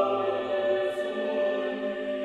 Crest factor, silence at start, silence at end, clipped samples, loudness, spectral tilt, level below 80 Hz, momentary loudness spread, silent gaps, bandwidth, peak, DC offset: 14 dB; 0 s; 0 s; under 0.1%; -28 LUFS; -5.5 dB/octave; -68 dBFS; 5 LU; none; 10.5 kHz; -14 dBFS; under 0.1%